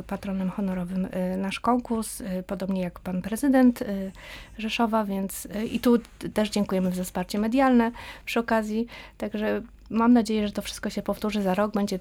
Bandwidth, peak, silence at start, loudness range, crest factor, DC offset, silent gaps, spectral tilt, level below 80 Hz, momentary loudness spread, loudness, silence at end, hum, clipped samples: 17 kHz; -10 dBFS; 0 s; 2 LU; 16 dB; under 0.1%; none; -6 dB/octave; -50 dBFS; 11 LU; -26 LUFS; 0 s; none; under 0.1%